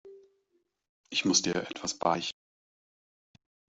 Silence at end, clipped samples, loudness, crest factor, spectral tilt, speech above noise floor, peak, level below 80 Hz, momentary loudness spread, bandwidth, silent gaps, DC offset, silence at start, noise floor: 1.4 s; under 0.1%; -29 LUFS; 24 dB; -2.5 dB/octave; 46 dB; -10 dBFS; -70 dBFS; 11 LU; 8.2 kHz; 0.89-1.04 s; under 0.1%; 0.05 s; -76 dBFS